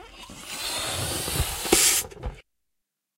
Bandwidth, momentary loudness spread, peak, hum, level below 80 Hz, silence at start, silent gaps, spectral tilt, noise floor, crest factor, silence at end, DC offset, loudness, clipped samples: 16 kHz; 21 LU; -4 dBFS; none; -42 dBFS; 0 s; none; -1.5 dB/octave; -80 dBFS; 24 dB; 0.75 s; under 0.1%; -23 LUFS; under 0.1%